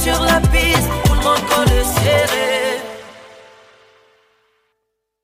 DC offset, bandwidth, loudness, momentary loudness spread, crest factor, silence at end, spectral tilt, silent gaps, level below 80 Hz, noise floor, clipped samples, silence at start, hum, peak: under 0.1%; 16 kHz; -15 LUFS; 8 LU; 16 dB; 1.95 s; -4 dB/octave; none; -24 dBFS; -74 dBFS; under 0.1%; 0 s; none; -2 dBFS